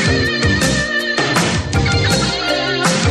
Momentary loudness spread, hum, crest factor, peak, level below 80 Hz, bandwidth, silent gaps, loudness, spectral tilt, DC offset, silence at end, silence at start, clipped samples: 2 LU; none; 14 dB; -2 dBFS; -30 dBFS; 13 kHz; none; -15 LUFS; -4 dB/octave; under 0.1%; 0 s; 0 s; under 0.1%